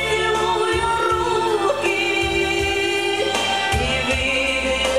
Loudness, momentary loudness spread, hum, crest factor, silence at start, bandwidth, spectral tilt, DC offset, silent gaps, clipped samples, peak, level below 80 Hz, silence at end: -19 LUFS; 1 LU; none; 12 dB; 0 s; 16 kHz; -3.5 dB/octave; 0.4%; none; under 0.1%; -6 dBFS; -36 dBFS; 0 s